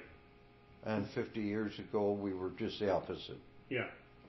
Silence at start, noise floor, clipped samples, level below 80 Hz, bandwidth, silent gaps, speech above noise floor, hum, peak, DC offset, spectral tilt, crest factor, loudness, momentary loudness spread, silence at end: 0 s; -62 dBFS; under 0.1%; -64 dBFS; 6 kHz; none; 24 dB; none; -20 dBFS; under 0.1%; -5 dB/octave; 18 dB; -39 LUFS; 12 LU; 0 s